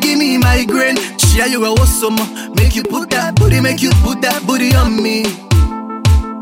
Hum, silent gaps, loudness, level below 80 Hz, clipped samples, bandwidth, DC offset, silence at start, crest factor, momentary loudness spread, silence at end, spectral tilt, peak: none; none; -13 LUFS; -18 dBFS; under 0.1%; 16.5 kHz; under 0.1%; 0 s; 12 dB; 5 LU; 0 s; -4.5 dB/octave; 0 dBFS